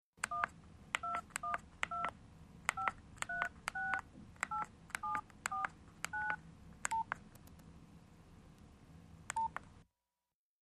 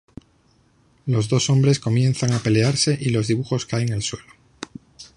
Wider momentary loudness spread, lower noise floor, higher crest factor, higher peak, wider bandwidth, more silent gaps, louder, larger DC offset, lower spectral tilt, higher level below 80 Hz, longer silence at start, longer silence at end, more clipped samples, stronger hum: about the same, 21 LU vs 20 LU; first, under -90 dBFS vs -59 dBFS; first, 30 dB vs 16 dB; second, -14 dBFS vs -6 dBFS; first, 14.5 kHz vs 11 kHz; neither; second, -42 LUFS vs -20 LUFS; neither; second, -2 dB/octave vs -5.5 dB/octave; second, -66 dBFS vs -52 dBFS; second, 0.2 s vs 1.05 s; first, 0.8 s vs 0.1 s; neither; neither